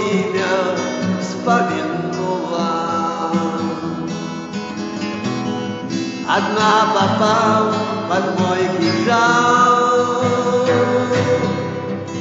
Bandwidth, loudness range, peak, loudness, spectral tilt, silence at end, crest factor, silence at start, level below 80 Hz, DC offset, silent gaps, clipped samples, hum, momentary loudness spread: 8 kHz; 7 LU; -4 dBFS; -18 LUFS; -4 dB/octave; 0 s; 14 dB; 0 s; -60 dBFS; under 0.1%; none; under 0.1%; none; 10 LU